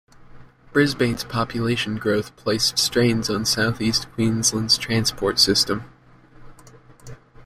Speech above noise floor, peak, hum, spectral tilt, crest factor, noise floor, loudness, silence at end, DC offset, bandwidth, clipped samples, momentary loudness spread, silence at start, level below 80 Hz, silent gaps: 27 dB; -4 dBFS; none; -3.5 dB/octave; 20 dB; -48 dBFS; -20 LUFS; 0.05 s; under 0.1%; 16 kHz; under 0.1%; 7 LU; 0.3 s; -48 dBFS; none